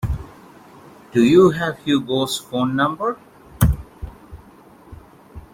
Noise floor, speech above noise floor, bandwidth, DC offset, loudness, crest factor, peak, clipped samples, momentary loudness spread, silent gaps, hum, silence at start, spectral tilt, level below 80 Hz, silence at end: -46 dBFS; 29 dB; 16.5 kHz; under 0.1%; -19 LUFS; 18 dB; -2 dBFS; under 0.1%; 23 LU; none; none; 0.05 s; -6 dB/octave; -34 dBFS; 0.15 s